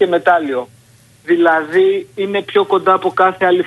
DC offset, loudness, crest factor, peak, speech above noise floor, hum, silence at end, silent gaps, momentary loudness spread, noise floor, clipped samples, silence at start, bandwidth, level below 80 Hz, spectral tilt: under 0.1%; -14 LUFS; 14 dB; 0 dBFS; 33 dB; none; 0 s; none; 9 LU; -47 dBFS; under 0.1%; 0 s; 12 kHz; -64 dBFS; -6 dB/octave